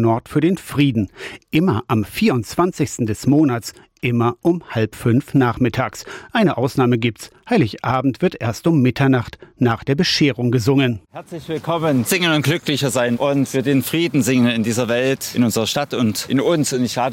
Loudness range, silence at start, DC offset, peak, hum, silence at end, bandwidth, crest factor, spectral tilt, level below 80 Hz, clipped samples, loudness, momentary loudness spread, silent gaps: 2 LU; 0 s; under 0.1%; -6 dBFS; none; 0 s; 17 kHz; 12 dB; -5.5 dB/octave; -50 dBFS; under 0.1%; -18 LUFS; 7 LU; none